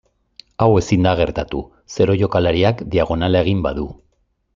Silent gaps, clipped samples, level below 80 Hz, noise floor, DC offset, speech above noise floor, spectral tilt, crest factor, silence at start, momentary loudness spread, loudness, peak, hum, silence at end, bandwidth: none; under 0.1%; -38 dBFS; -64 dBFS; under 0.1%; 47 dB; -7 dB/octave; 16 dB; 0.6 s; 12 LU; -18 LUFS; -2 dBFS; none; 0.6 s; 7.6 kHz